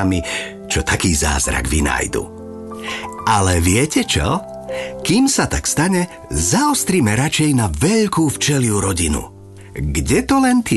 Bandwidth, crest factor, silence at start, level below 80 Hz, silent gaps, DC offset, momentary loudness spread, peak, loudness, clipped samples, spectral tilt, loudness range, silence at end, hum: 12.5 kHz; 14 dB; 0 s; -28 dBFS; none; under 0.1%; 12 LU; -4 dBFS; -17 LUFS; under 0.1%; -4 dB/octave; 3 LU; 0 s; none